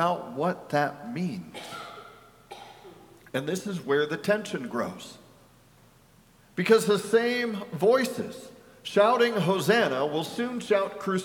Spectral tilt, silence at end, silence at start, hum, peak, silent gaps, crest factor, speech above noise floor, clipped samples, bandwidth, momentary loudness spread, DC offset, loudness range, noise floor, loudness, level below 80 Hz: -5 dB/octave; 0 s; 0 s; none; -6 dBFS; none; 22 dB; 32 dB; under 0.1%; 18 kHz; 20 LU; under 0.1%; 8 LU; -58 dBFS; -26 LUFS; -68 dBFS